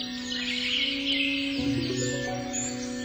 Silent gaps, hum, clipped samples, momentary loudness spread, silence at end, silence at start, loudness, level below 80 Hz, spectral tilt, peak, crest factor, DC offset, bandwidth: none; none; under 0.1%; 6 LU; 0 s; 0 s; -27 LUFS; -52 dBFS; -3 dB/octave; -16 dBFS; 14 dB; under 0.1%; over 20 kHz